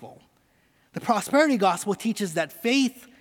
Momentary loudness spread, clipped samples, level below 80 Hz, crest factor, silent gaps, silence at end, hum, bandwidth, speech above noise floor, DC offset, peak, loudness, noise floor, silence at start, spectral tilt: 7 LU; under 0.1%; -72 dBFS; 18 dB; none; 0.2 s; none; 18.5 kHz; 40 dB; under 0.1%; -8 dBFS; -24 LUFS; -64 dBFS; 0 s; -4 dB/octave